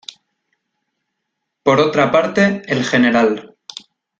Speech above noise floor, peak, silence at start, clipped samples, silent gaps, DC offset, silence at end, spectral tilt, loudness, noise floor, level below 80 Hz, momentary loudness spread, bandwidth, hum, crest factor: 61 dB; 0 dBFS; 1.65 s; under 0.1%; none; under 0.1%; 0.75 s; -5.5 dB/octave; -15 LUFS; -76 dBFS; -56 dBFS; 21 LU; 7.8 kHz; none; 16 dB